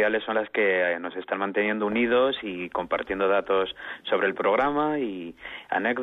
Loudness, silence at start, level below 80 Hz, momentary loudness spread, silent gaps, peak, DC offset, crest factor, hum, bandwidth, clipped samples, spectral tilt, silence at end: -25 LUFS; 0 s; -60 dBFS; 9 LU; none; -12 dBFS; under 0.1%; 14 dB; none; 4.1 kHz; under 0.1%; -7 dB/octave; 0 s